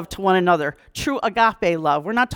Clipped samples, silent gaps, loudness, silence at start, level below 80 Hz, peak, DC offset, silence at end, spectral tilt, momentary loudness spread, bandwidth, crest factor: under 0.1%; none; -20 LUFS; 0 s; -48 dBFS; -4 dBFS; under 0.1%; 0 s; -5 dB/octave; 8 LU; 19 kHz; 16 dB